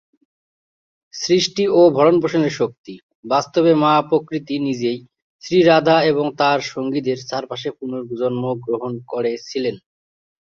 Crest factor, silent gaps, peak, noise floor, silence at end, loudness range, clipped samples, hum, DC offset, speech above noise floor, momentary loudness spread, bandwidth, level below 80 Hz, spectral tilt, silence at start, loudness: 18 dB; 2.78-2.84 s, 3.03-3.09 s, 3.15-3.23 s, 5.22-5.39 s; -2 dBFS; under -90 dBFS; 0.75 s; 7 LU; under 0.1%; none; under 0.1%; over 72 dB; 14 LU; 7.6 kHz; -62 dBFS; -5.5 dB/octave; 1.15 s; -18 LUFS